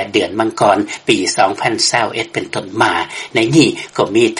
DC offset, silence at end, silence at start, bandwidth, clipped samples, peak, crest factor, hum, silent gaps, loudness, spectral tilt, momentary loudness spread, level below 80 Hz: under 0.1%; 0 s; 0 s; 11.5 kHz; under 0.1%; 0 dBFS; 14 dB; none; none; -15 LUFS; -3.5 dB/octave; 7 LU; -54 dBFS